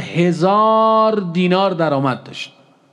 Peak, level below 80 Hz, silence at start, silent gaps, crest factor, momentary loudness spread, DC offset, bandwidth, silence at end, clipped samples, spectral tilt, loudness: -2 dBFS; -70 dBFS; 0 s; none; 14 dB; 16 LU; under 0.1%; 10 kHz; 0.45 s; under 0.1%; -7 dB/octave; -15 LUFS